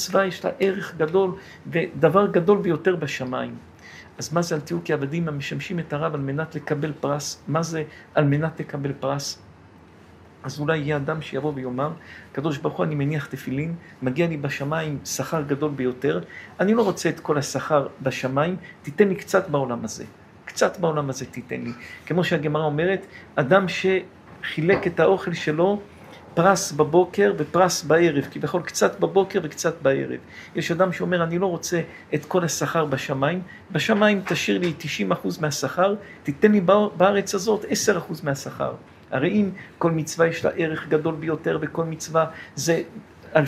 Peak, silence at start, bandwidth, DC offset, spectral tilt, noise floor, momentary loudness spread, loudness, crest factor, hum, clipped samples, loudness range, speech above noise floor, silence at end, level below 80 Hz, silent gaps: -2 dBFS; 0 s; 16 kHz; under 0.1%; -5.5 dB/octave; -48 dBFS; 11 LU; -23 LUFS; 22 dB; none; under 0.1%; 6 LU; 26 dB; 0 s; -62 dBFS; none